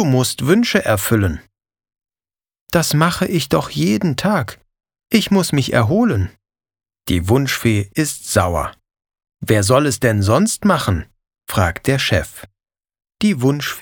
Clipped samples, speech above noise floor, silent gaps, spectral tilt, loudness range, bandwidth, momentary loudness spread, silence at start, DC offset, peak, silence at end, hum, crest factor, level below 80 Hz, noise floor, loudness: under 0.1%; over 74 dB; 2.61-2.66 s; -5 dB/octave; 2 LU; over 20 kHz; 8 LU; 0 s; under 0.1%; 0 dBFS; 0 s; none; 18 dB; -42 dBFS; under -90 dBFS; -17 LUFS